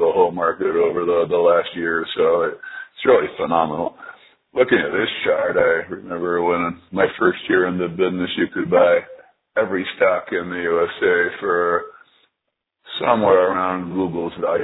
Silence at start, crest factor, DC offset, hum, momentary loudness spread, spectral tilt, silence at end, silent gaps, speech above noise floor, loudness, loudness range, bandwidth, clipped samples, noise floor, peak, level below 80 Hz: 0 s; 20 dB; under 0.1%; none; 9 LU; -9 dB/octave; 0 s; none; 60 dB; -19 LUFS; 2 LU; 4.1 kHz; under 0.1%; -78 dBFS; 0 dBFS; -58 dBFS